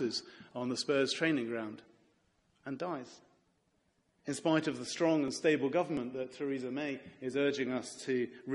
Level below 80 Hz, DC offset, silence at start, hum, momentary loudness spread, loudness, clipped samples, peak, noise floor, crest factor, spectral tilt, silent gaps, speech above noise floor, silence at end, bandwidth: -78 dBFS; under 0.1%; 0 s; none; 13 LU; -34 LUFS; under 0.1%; -16 dBFS; -76 dBFS; 20 dB; -4.5 dB/octave; none; 41 dB; 0 s; 11.5 kHz